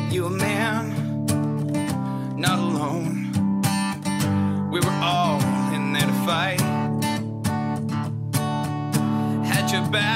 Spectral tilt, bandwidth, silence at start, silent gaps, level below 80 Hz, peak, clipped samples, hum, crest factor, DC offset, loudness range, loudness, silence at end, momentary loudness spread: -5 dB/octave; 16 kHz; 0 s; none; -56 dBFS; -8 dBFS; under 0.1%; none; 16 dB; under 0.1%; 2 LU; -23 LUFS; 0 s; 5 LU